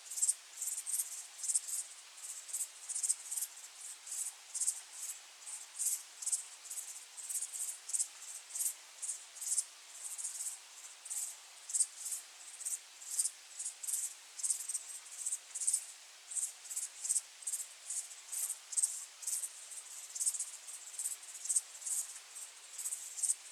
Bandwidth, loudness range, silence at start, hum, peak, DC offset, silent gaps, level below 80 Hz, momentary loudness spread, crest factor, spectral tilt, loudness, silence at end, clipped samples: over 20 kHz; 2 LU; 0 s; none; -16 dBFS; under 0.1%; none; under -90 dBFS; 12 LU; 26 dB; 7.5 dB/octave; -38 LUFS; 0 s; under 0.1%